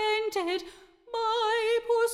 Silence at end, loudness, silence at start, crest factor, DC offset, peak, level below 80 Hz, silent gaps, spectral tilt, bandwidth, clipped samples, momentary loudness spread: 0 s; -28 LUFS; 0 s; 12 dB; under 0.1%; -16 dBFS; -66 dBFS; none; -1 dB/octave; 15 kHz; under 0.1%; 10 LU